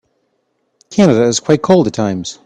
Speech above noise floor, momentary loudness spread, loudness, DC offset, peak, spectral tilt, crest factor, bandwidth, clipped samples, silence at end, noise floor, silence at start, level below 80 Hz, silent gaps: 53 dB; 8 LU; -13 LUFS; under 0.1%; 0 dBFS; -5.5 dB/octave; 14 dB; 10.5 kHz; under 0.1%; 0.15 s; -65 dBFS; 0.9 s; -50 dBFS; none